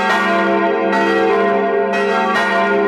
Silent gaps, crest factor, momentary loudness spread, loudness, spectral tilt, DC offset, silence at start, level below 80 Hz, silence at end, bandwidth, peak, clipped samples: none; 12 dB; 2 LU; -15 LUFS; -5.5 dB/octave; under 0.1%; 0 s; -58 dBFS; 0 s; 14 kHz; -4 dBFS; under 0.1%